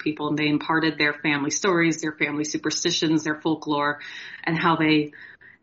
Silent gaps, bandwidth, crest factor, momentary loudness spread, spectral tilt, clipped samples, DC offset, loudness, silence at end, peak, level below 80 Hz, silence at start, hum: none; 7.6 kHz; 16 dB; 6 LU; -3 dB/octave; under 0.1%; under 0.1%; -23 LUFS; 0.3 s; -8 dBFS; -66 dBFS; 0 s; none